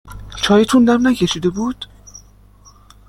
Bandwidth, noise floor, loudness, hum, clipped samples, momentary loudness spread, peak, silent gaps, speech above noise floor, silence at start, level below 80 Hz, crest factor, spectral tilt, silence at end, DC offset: 15 kHz; -46 dBFS; -15 LUFS; 50 Hz at -40 dBFS; under 0.1%; 20 LU; -2 dBFS; none; 32 dB; 0.05 s; -42 dBFS; 16 dB; -5 dB/octave; 0.9 s; under 0.1%